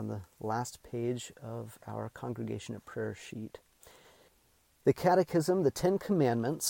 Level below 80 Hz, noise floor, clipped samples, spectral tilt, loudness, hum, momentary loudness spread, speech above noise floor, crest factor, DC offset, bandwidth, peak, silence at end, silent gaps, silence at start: -64 dBFS; -69 dBFS; under 0.1%; -5.5 dB/octave; -33 LUFS; none; 15 LU; 36 dB; 20 dB; under 0.1%; 17 kHz; -14 dBFS; 0 s; none; 0 s